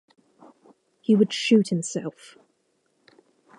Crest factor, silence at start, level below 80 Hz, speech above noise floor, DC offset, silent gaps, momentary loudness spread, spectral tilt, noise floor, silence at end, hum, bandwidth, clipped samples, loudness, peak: 20 dB; 1.1 s; -82 dBFS; 48 dB; under 0.1%; none; 13 LU; -5.5 dB/octave; -70 dBFS; 1.5 s; none; 11.5 kHz; under 0.1%; -23 LUFS; -8 dBFS